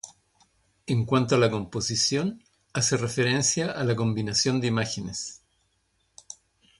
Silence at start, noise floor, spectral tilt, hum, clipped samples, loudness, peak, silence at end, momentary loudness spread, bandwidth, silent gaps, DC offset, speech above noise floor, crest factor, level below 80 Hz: 0.05 s; -71 dBFS; -4 dB/octave; none; under 0.1%; -25 LUFS; -8 dBFS; 0.45 s; 21 LU; 11.5 kHz; none; under 0.1%; 46 dB; 18 dB; -58 dBFS